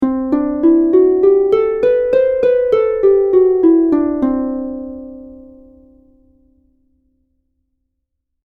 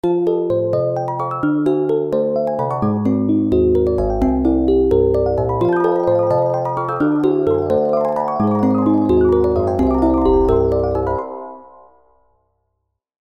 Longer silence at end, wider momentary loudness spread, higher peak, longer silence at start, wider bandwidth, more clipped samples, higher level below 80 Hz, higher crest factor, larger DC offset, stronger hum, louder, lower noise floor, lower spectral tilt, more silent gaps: first, 3.1 s vs 1.7 s; first, 12 LU vs 6 LU; about the same, -2 dBFS vs -2 dBFS; about the same, 0 s vs 0.05 s; second, 4.2 kHz vs 6.4 kHz; neither; second, -46 dBFS vs -32 dBFS; about the same, 14 dB vs 14 dB; second, under 0.1% vs 0.1%; neither; first, -13 LUFS vs -17 LUFS; about the same, -73 dBFS vs -73 dBFS; second, -8.5 dB/octave vs -10 dB/octave; neither